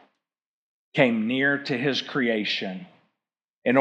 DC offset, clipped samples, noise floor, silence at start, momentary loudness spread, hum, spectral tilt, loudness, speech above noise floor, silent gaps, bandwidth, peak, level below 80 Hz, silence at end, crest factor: under 0.1%; under 0.1%; -85 dBFS; 0.95 s; 9 LU; none; -5.5 dB/octave; -24 LUFS; 61 dB; 3.50-3.62 s; 8.2 kHz; -4 dBFS; under -90 dBFS; 0 s; 22 dB